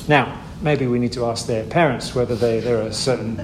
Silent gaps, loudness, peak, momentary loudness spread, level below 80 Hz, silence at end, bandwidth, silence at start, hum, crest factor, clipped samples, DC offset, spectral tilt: none; -20 LUFS; 0 dBFS; 5 LU; -42 dBFS; 0 s; 15 kHz; 0 s; none; 20 dB; under 0.1%; under 0.1%; -5.5 dB/octave